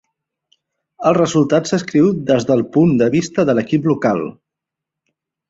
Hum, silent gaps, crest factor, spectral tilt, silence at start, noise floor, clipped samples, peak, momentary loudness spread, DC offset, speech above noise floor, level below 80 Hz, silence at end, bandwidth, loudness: none; none; 16 dB; -6.5 dB/octave; 1 s; -83 dBFS; under 0.1%; -2 dBFS; 4 LU; under 0.1%; 68 dB; -54 dBFS; 1.2 s; 7.8 kHz; -16 LUFS